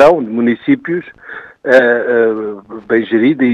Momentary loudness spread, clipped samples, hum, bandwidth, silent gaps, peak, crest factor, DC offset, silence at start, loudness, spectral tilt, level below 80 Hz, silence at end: 19 LU; 0.3%; none; 8.8 kHz; none; 0 dBFS; 12 dB; under 0.1%; 0 s; -13 LUFS; -7 dB/octave; -54 dBFS; 0 s